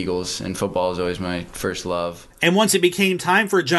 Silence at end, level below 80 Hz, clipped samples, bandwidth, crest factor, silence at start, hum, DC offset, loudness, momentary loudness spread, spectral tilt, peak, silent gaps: 0 s; -48 dBFS; under 0.1%; 12.5 kHz; 18 dB; 0 s; none; under 0.1%; -21 LUFS; 10 LU; -4 dB/octave; -2 dBFS; none